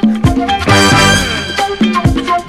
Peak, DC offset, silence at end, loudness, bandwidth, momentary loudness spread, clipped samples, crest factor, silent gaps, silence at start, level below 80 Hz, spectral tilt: 0 dBFS; under 0.1%; 0 s; -10 LUFS; 16 kHz; 8 LU; under 0.1%; 10 dB; none; 0 s; -26 dBFS; -4.5 dB/octave